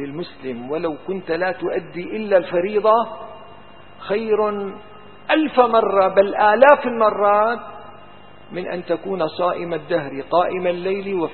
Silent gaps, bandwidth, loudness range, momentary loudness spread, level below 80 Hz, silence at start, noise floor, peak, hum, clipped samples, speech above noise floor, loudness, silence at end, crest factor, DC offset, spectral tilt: none; 4.4 kHz; 7 LU; 15 LU; -58 dBFS; 0 s; -44 dBFS; 0 dBFS; none; under 0.1%; 25 dB; -19 LUFS; 0 s; 20 dB; 0.7%; -8.5 dB/octave